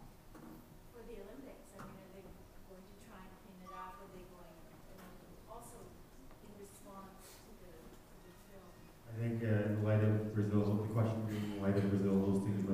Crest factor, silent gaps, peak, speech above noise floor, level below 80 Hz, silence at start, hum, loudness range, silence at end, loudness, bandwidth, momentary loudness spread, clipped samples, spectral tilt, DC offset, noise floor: 20 dB; none; -20 dBFS; 23 dB; -60 dBFS; 0 s; none; 21 LU; 0 s; -36 LUFS; 15.5 kHz; 24 LU; under 0.1%; -8 dB/octave; under 0.1%; -58 dBFS